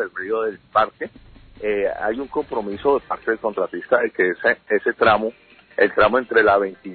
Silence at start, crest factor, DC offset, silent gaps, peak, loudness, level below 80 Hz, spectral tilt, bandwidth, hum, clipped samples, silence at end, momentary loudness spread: 0 s; 16 dB; under 0.1%; none; -4 dBFS; -20 LUFS; -52 dBFS; -9.5 dB/octave; 4.5 kHz; none; under 0.1%; 0 s; 10 LU